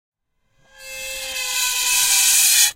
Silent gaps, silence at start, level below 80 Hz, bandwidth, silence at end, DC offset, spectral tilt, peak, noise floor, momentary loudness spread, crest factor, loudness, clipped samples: none; 0.8 s; -54 dBFS; 16 kHz; 0 s; under 0.1%; 4.5 dB/octave; 0 dBFS; -64 dBFS; 17 LU; 20 dB; -15 LUFS; under 0.1%